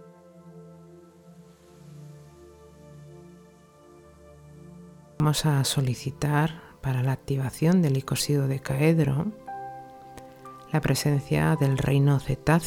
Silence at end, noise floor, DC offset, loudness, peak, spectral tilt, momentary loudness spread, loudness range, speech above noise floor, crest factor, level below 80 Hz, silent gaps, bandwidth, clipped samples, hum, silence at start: 0 s; -53 dBFS; under 0.1%; -25 LUFS; -8 dBFS; -6 dB/octave; 24 LU; 4 LU; 29 dB; 20 dB; -50 dBFS; none; 18 kHz; under 0.1%; none; 0 s